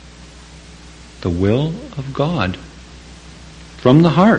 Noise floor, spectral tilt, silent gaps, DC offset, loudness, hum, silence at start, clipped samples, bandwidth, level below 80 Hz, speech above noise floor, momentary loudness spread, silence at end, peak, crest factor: -39 dBFS; -7.5 dB/octave; none; under 0.1%; -17 LUFS; 60 Hz at -40 dBFS; 0.2 s; under 0.1%; 9.4 kHz; -40 dBFS; 25 dB; 27 LU; 0 s; 0 dBFS; 18 dB